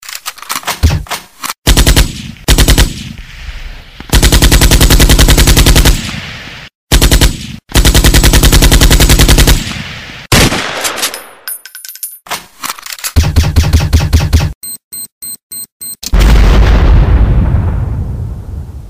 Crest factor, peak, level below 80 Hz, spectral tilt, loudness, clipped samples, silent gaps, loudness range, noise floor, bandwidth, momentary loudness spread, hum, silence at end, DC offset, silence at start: 8 dB; 0 dBFS; -12 dBFS; -4 dB/octave; -9 LUFS; 0.7%; 1.58-1.62 s, 6.75-6.87 s, 14.55-14.61 s, 14.84-14.91 s, 15.12-15.21 s, 15.43-15.50 s, 15.72-15.80 s; 6 LU; -28 dBFS; 16.5 kHz; 18 LU; none; 0 s; 0.5%; 0.05 s